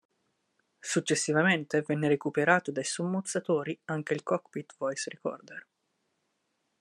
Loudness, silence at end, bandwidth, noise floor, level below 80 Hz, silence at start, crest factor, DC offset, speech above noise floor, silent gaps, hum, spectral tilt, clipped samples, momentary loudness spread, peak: -30 LUFS; 1.2 s; 12.5 kHz; -78 dBFS; -76 dBFS; 0.85 s; 24 dB; under 0.1%; 49 dB; none; none; -4.5 dB/octave; under 0.1%; 13 LU; -8 dBFS